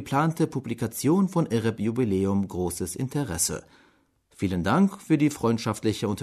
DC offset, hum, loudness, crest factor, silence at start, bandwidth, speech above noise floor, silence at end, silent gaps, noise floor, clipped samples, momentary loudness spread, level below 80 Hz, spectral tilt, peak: under 0.1%; none; -26 LUFS; 16 dB; 0 s; 13.5 kHz; 38 dB; 0 s; none; -63 dBFS; under 0.1%; 7 LU; -54 dBFS; -5.5 dB/octave; -10 dBFS